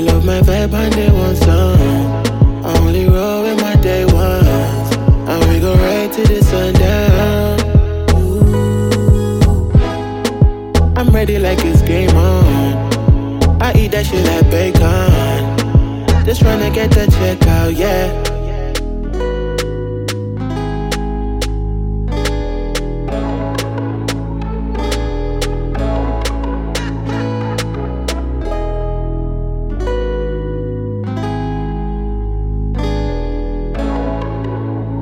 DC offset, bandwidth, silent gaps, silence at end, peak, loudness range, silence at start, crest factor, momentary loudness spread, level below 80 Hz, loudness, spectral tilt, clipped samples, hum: under 0.1%; 17 kHz; none; 0 s; 0 dBFS; 8 LU; 0 s; 12 dB; 10 LU; -18 dBFS; -15 LUFS; -6.5 dB/octave; under 0.1%; none